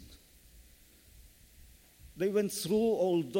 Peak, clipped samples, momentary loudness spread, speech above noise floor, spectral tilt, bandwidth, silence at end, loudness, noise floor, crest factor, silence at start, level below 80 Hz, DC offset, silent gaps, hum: -18 dBFS; under 0.1%; 4 LU; 30 dB; -5.5 dB/octave; 16.5 kHz; 0 s; -31 LUFS; -60 dBFS; 16 dB; 0 s; -60 dBFS; under 0.1%; none; none